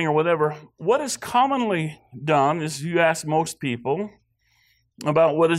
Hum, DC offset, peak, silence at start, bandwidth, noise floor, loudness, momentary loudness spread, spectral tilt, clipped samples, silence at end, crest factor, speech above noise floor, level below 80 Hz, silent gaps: none; under 0.1%; -8 dBFS; 0 s; 15.5 kHz; -65 dBFS; -23 LUFS; 9 LU; -5 dB/octave; under 0.1%; 0 s; 14 dB; 43 dB; -64 dBFS; none